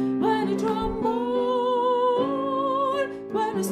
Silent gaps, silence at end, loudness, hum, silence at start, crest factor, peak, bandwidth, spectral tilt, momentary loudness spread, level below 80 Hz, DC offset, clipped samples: none; 0 s; -24 LUFS; none; 0 s; 12 dB; -12 dBFS; 15.5 kHz; -5.5 dB/octave; 4 LU; -48 dBFS; under 0.1%; under 0.1%